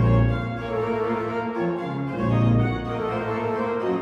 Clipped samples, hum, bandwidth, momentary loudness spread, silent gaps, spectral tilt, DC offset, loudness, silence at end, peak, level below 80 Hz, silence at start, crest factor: under 0.1%; none; 6 kHz; 7 LU; none; -9 dB/octave; under 0.1%; -24 LUFS; 0 s; -10 dBFS; -38 dBFS; 0 s; 14 dB